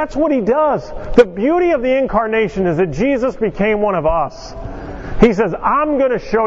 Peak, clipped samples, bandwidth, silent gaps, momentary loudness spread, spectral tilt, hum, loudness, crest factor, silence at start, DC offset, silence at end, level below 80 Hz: 0 dBFS; 0.1%; 7.8 kHz; none; 11 LU; -7 dB/octave; none; -15 LUFS; 16 dB; 0 s; under 0.1%; 0 s; -32 dBFS